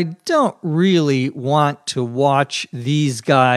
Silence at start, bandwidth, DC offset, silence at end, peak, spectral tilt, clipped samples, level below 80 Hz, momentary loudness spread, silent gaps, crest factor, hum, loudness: 0 s; 13 kHz; under 0.1%; 0 s; 0 dBFS; -5.5 dB/octave; under 0.1%; -68 dBFS; 7 LU; none; 18 dB; none; -18 LUFS